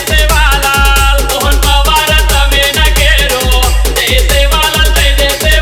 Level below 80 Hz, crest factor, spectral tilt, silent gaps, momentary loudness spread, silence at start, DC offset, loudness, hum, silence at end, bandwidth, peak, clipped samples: -10 dBFS; 8 dB; -2.5 dB/octave; none; 2 LU; 0 s; under 0.1%; -8 LUFS; none; 0 s; 17.5 kHz; 0 dBFS; under 0.1%